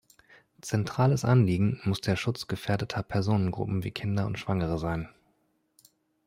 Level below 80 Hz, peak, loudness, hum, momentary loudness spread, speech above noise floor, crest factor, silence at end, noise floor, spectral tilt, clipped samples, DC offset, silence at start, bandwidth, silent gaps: -54 dBFS; -12 dBFS; -28 LUFS; none; 9 LU; 44 dB; 18 dB; 1.15 s; -72 dBFS; -6.5 dB/octave; under 0.1%; under 0.1%; 0.65 s; 15.5 kHz; none